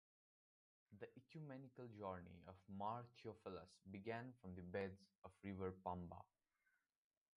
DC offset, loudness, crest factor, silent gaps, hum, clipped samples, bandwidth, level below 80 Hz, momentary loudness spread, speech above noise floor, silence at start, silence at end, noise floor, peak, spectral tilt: under 0.1%; -54 LUFS; 20 dB; 5.18-5.22 s; none; under 0.1%; 11 kHz; -74 dBFS; 11 LU; 34 dB; 0.9 s; 1.1 s; -87 dBFS; -34 dBFS; -7.5 dB/octave